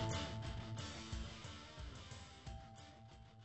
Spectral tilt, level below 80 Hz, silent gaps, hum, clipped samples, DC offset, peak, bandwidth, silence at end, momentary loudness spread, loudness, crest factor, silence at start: -4.5 dB/octave; -56 dBFS; none; none; under 0.1%; under 0.1%; -30 dBFS; 8.2 kHz; 0 s; 13 LU; -50 LUFS; 18 dB; 0 s